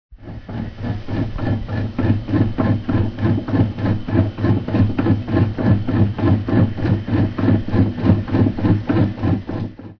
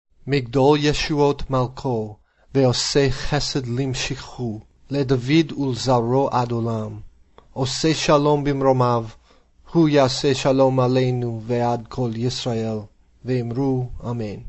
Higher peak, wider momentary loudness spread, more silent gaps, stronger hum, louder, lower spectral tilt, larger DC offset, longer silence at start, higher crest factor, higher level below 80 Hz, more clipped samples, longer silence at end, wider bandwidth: about the same, -2 dBFS vs -4 dBFS; second, 8 LU vs 11 LU; neither; neither; about the same, -19 LUFS vs -21 LUFS; first, -10 dB/octave vs -5.5 dB/octave; neither; second, 0.1 s vs 0.25 s; about the same, 16 dB vs 16 dB; first, -34 dBFS vs -40 dBFS; neither; about the same, 0.05 s vs 0 s; second, 5.4 kHz vs 8.4 kHz